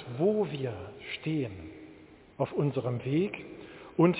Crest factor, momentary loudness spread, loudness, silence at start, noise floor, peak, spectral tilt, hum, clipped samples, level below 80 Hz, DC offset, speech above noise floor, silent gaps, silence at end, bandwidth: 20 dB; 18 LU; -32 LUFS; 0 s; -54 dBFS; -10 dBFS; -7 dB/octave; none; under 0.1%; -60 dBFS; under 0.1%; 23 dB; none; 0 s; 4 kHz